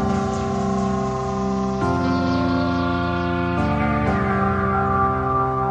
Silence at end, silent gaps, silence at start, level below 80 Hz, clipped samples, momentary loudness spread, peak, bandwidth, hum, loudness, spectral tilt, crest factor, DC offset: 0 s; none; 0 s; -38 dBFS; under 0.1%; 3 LU; -8 dBFS; 9.2 kHz; none; -21 LUFS; -7.5 dB/octave; 12 dB; under 0.1%